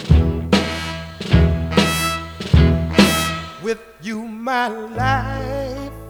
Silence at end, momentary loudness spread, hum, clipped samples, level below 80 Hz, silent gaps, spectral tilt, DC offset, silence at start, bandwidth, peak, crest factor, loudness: 0 s; 13 LU; none; under 0.1%; -26 dBFS; none; -5.5 dB/octave; under 0.1%; 0 s; 18.5 kHz; 0 dBFS; 18 dB; -19 LUFS